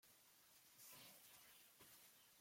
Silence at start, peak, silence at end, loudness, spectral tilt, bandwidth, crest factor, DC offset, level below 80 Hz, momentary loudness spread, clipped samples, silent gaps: 0 s; -50 dBFS; 0 s; -65 LUFS; -0.5 dB/octave; 16.5 kHz; 18 dB; under 0.1%; under -90 dBFS; 8 LU; under 0.1%; none